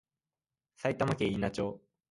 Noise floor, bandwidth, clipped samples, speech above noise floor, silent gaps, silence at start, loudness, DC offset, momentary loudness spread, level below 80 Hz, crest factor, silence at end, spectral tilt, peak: under -90 dBFS; 11.5 kHz; under 0.1%; over 58 dB; none; 0.8 s; -33 LUFS; under 0.1%; 7 LU; -58 dBFS; 20 dB; 0.35 s; -6.5 dB/octave; -16 dBFS